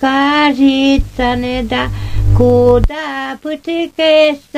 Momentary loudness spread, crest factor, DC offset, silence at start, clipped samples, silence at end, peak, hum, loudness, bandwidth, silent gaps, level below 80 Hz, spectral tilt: 11 LU; 12 dB; under 0.1%; 0 s; under 0.1%; 0 s; 0 dBFS; none; -13 LUFS; 14.5 kHz; none; -22 dBFS; -6.5 dB/octave